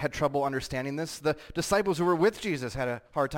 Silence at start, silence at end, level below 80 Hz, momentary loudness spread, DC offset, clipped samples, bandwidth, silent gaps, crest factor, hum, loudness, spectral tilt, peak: 0 s; 0 s; -52 dBFS; 7 LU; under 0.1%; under 0.1%; 17 kHz; none; 16 dB; none; -29 LUFS; -5 dB/octave; -14 dBFS